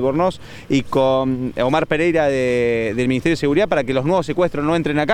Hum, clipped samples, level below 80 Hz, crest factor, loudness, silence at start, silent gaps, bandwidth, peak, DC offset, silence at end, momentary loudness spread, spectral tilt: none; under 0.1%; -44 dBFS; 14 dB; -18 LUFS; 0 s; none; 17 kHz; -4 dBFS; under 0.1%; 0 s; 4 LU; -6.5 dB/octave